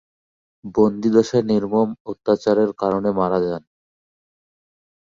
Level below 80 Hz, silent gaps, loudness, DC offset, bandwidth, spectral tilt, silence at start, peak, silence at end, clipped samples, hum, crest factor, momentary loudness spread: -56 dBFS; 2.00-2.05 s; -20 LUFS; under 0.1%; 7.4 kHz; -7.5 dB/octave; 0.65 s; -2 dBFS; 1.45 s; under 0.1%; none; 18 dB; 9 LU